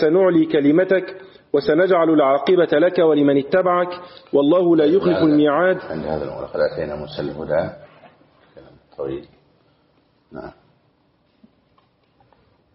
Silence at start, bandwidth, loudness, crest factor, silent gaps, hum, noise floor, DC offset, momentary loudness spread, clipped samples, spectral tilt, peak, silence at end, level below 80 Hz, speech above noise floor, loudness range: 0 s; 5.8 kHz; -18 LUFS; 14 dB; none; none; -61 dBFS; under 0.1%; 14 LU; under 0.1%; -5.5 dB/octave; -6 dBFS; 2.25 s; -54 dBFS; 44 dB; 21 LU